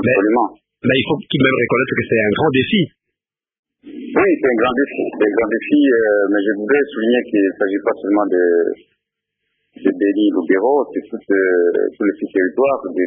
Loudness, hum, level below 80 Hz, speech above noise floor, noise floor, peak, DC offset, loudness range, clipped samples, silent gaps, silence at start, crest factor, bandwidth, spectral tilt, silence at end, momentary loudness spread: -16 LUFS; none; -54 dBFS; 66 dB; -82 dBFS; -2 dBFS; under 0.1%; 2 LU; under 0.1%; 3.59-3.63 s; 0 s; 16 dB; 3.8 kHz; -11.5 dB/octave; 0 s; 6 LU